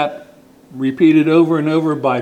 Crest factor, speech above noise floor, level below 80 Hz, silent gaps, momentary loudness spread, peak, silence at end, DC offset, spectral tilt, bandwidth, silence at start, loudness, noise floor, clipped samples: 14 dB; 30 dB; -62 dBFS; none; 11 LU; -2 dBFS; 0 s; under 0.1%; -8 dB/octave; 8.6 kHz; 0 s; -14 LUFS; -43 dBFS; under 0.1%